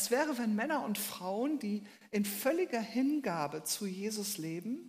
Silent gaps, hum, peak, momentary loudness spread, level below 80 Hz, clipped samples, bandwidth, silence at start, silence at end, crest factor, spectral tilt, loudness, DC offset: none; none; -18 dBFS; 6 LU; -84 dBFS; under 0.1%; 15.5 kHz; 0 s; 0 s; 16 dB; -4 dB/octave; -35 LUFS; under 0.1%